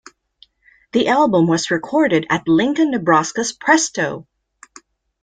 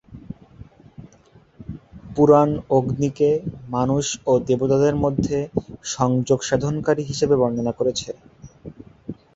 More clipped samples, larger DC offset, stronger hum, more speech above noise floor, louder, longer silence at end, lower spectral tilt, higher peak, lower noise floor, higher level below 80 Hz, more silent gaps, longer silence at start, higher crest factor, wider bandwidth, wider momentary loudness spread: neither; neither; neither; first, 37 dB vs 33 dB; first, -17 LUFS vs -20 LUFS; first, 1 s vs 0.2 s; second, -4.5 dB/octave vs -6 dB/octave; about the same, -2 dBFS vs -2 dBFS; about the same, -54 dBFS vs -53 dBFS; second, -58 dBFS vs -46 dBFS; neither; first, 0.95 s vs 0.1 s; about the same, 16 dB vs 20 dB; first, 9.4 kHz vs 8 kHz; second, 8 LU vs 22 LU